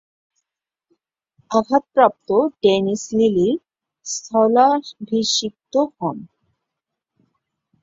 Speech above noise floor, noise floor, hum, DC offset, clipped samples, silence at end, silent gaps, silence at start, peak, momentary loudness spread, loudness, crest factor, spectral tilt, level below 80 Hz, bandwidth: 67 dB; -85 dBFS; none; under 0.1%; under 0.1%; 1.6 s; none; 1.5 s; -2 dBFS; 12 LU; -19 LUFS; 18 dB; -4 dB/octave; -62 dBFS; 7.8 kHz